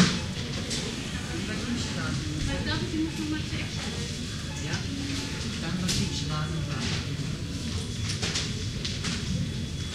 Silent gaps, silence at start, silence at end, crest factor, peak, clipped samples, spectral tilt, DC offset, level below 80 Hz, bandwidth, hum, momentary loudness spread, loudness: none; 0 s; 0 s; 24 dB; -6 dBFS; under 0.1%; -4 dB/octave; under 0.1%; -42 dBFS; 15.5 kHz; none; 5 LU; -30 LUFS